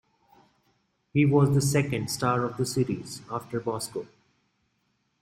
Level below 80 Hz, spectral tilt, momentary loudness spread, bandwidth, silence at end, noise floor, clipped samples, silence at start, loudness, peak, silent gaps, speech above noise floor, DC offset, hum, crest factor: -60 dBFS; -6 dB/octave; 14 LU; 16 kHz; 1.15 s; -73 dBFS; under 0.1%; 1.15 s; -27 LUFS; -10 dBFS; none; 48 dB; under 0.1%; none; 18 dB